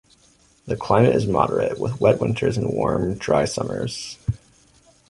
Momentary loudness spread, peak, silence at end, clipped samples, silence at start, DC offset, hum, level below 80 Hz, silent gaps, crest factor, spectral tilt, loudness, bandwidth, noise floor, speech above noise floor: 12 LU; -2 dBFS; 0.75 s; under 0.1%; 0.65 s; under 0.1%; none; -44 dBFS; none; 20 dB; -6.5 dB/octave; -21 LUFS; 11.5 kHz; -57 dBFS; 36 dB